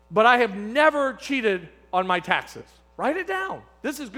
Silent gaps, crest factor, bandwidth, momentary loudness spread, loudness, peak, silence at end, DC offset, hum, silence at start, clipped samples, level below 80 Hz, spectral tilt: none; 22 dB; 18.5 kHz; 14 LU; -23 LUFS; -2 dBFS; 0 s; under 0.1%; none; 0.1 s; under 0.1%; -58 dBFS; -4.5 dB/octave